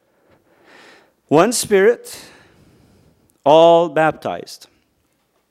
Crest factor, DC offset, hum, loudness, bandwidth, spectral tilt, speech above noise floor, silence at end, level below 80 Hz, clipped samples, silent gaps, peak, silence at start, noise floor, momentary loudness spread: 18 dB; under 0.1%; none; -15 LUFS; 16 kHz; -4 dB/octave; 50 dB; 0.95 s; -62 dBFS; under 0.1%; none; 0 dBFS; 1.3 s; -64 dBFS; 22 LU